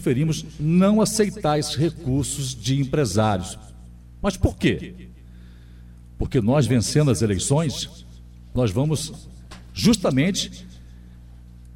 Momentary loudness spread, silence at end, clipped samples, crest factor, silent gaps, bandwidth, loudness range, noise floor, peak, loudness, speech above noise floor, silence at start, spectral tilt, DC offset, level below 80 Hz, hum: 14 LU; 0 s; under 0.1%; 16 dB; none; 16 kHz; 4 LU; -43 dBFS; -6 dBFS; -22 LUFS; 22 dB; 0 s; -5.5 dB/octave; under 0.1%; -40 dBFS; 60 Hz at -45 dBFS